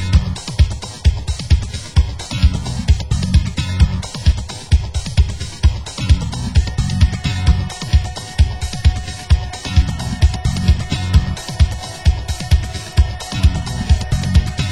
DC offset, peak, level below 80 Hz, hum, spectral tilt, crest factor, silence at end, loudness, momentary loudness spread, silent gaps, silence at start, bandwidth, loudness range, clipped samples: under 0.1%; 0 dBFS; -18 dBFS; none; -5.5 dB/octave; 16 dB; 0 s; -18 LUFS; 4 LU; none; 0 s; 12 kHz; 1 LU; under 0.1%